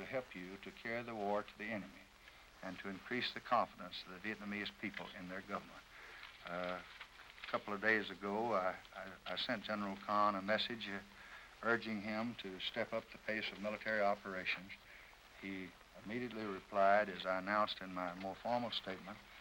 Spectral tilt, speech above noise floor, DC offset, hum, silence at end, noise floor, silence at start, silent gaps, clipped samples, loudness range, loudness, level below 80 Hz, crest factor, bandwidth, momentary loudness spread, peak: -5 dB/octave; 21 dB; under 0.1%; none; 0 s; -62 dBFS; 0 s; none; under 0.1%; 6 LU; -41 LUFS; -72 dBFS; 22 dB; 16 kHz; 18 LU; -20 dBFS